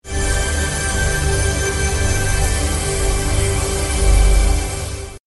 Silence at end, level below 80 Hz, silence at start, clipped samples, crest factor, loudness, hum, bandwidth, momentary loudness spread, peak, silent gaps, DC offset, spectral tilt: 0.1 s; -20 dBFS; 0.05 s; under 0.1%; 14 dB; -18 LUFS; none; 12.5 kHz; 4 LU; -2 dBFS; none; under 0.1%; -3.5 dB/octave